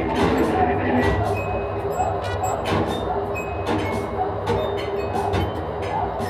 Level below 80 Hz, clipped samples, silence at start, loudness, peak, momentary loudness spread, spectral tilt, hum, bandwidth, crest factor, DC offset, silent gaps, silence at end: -36 dBFS; under 0.1%; 0 s; -23 LUFS; -6 dBFS; 6 LU; -6.5 dB/octave; none; 14 kHz; 16 dB; under 0.1%; none; 0 s